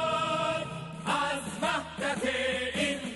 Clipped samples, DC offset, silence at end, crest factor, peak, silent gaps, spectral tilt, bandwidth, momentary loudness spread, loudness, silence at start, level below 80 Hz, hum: under 0.1%; under 0.1%; 0 s; 16 dB; -16 dBFS; none; -3.5 dB/octave; 11.5 kHz; 5 LU; -30 LUFS; 0 s; -58 dBFS; none